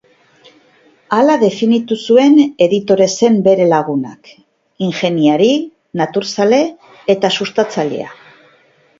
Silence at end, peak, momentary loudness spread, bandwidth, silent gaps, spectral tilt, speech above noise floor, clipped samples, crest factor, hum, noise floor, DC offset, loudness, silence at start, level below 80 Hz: 0.85 s; 0 dBFS; 11 LU; 7.8 kHz; none; -5.5 dB/octave; 39 dB; under 0.1%; 14 dB; none; -51 dBFS; under 0.1%; -13 LUFS; 1.1 s; -62 dBFS